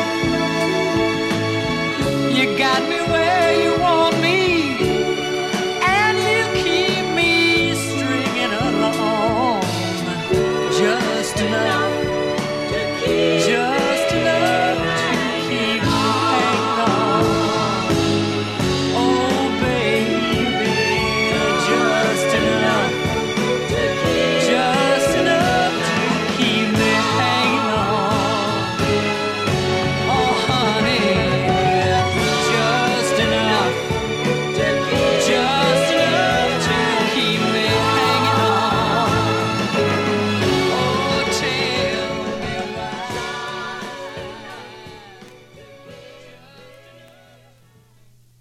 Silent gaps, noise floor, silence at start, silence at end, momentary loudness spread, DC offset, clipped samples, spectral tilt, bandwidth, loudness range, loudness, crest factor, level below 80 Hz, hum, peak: none; -51 dBFS; 0 s; 1.7 s; 5 LU; under 0.1%; under 0.1%; -4.5 dB/octave; 15.5 kHz; 3 LU; -18 LUFS; 14 dB; -44 dBFS; none; -4 dBFS